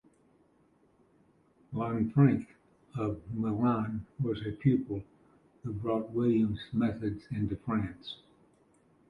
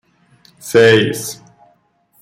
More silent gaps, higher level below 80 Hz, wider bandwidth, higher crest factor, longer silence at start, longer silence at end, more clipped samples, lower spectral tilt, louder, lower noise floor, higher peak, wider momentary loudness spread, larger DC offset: neither; about the same, -58 dBFS vs -56 dBFS; second, 5.2 kHz vs 15.5 kHz; first, 22 dB vs 16 dB; first, 1.7 s vs 0.65 s; about the same, 0.95 s vs 0.9 s; neither; first, -10 dB/octave vs -4.5 dB/octave; second, -32 LUFS vs -13 LUFS; first, -67 dBFS vs -57 dBFS; second, -12 dBFS vs 0 dBFS; second, 15 LU vs 24 LU; neither